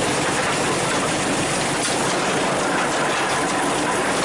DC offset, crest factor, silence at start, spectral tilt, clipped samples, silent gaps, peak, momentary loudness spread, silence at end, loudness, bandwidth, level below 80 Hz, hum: under 0.1%; 10 dB; 0 s; -3 dB/octave; under 0.1%; none; -10 dBFS; 0 LU; 0 s; -20 LUFS; 12 kHz; -48 dBFS; none